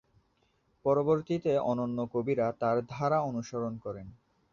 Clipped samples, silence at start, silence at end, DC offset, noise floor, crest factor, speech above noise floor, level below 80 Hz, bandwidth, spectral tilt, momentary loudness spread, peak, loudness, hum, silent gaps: under 0.1%; 0.85 s; 0.4 s; under 0.1%; -72 dBFS; 18 dB; 42 dB; -64 dBFS; 7.2 kHz; -8 dB/octave; 8 LU; -14 dBFS; -31 LUFS; none; none